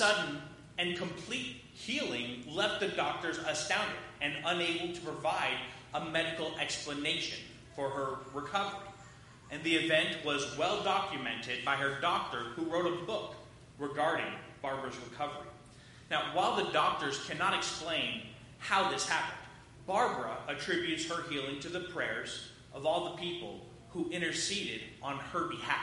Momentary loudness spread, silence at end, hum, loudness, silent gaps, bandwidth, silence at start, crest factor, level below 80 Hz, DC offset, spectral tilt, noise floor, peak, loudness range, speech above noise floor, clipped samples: 12 LU; 0 s; none; -34 LUFS; none; 11.5 kHz; 0 s; 22 dB; -66 dBFS; under 0.1%; -3 dB/octave; -55 dBFS; -12 dBFS; 4 LU; 20 dB; under 0.1%